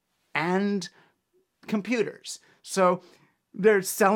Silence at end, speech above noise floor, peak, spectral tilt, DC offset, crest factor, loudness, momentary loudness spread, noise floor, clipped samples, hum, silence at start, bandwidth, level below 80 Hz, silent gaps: 0 s; 45 dB; -8 dBFS; -4.5 dB/octave; under 0.1%; 20 dB; -26 LUFS; 18 LU; -71 dBFS; under 0.1%; none; 0.35 s; 18 kHz; -78 dBFS; none